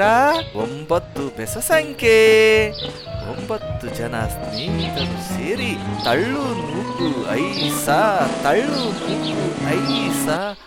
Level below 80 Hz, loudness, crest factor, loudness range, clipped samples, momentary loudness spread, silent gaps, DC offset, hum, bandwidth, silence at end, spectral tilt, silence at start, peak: -42 dBFS; -19 LUFS; 14 dB; 5 LU; under 0.1%; 12 LU; none; under 0.1%; none; 17 kHz; 0 s; -4.5 dB/octave; 0 s; -4 dBFS